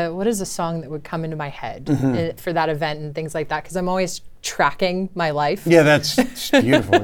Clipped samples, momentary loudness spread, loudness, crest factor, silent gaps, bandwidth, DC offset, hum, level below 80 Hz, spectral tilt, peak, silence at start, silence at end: under 0.1%; 13 LU; -20 LUFS; 20 dB; none; 19 kHz; under 0.1%; none; -46 dBFS; -5 dB/octave; 0 dBFS; 0 s; 0 s